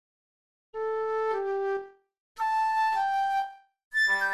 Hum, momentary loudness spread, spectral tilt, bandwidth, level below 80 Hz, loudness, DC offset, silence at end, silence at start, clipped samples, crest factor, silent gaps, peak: none; 10 LU; -1.5 dB/octave; 13.5 kHz; -72 dBFS; -28 LUFS; under 0.1%; 0 s; 0.75 s; under 0.1%; 12 dB; 2.20-2.35 s, 3.84-3.91 s; -16 dBFS